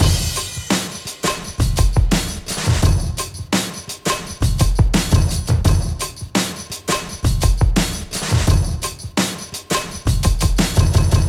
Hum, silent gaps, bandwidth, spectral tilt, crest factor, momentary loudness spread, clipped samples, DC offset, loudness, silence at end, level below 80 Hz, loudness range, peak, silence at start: none; none; 17 kHz; -4.5 dB/octave; 16 dB; 8 LU; under 0.1%; under 0.1%; -19 LUFS; 0 s; -22 dBFS; 1 LU; -2 dBFS; 0 s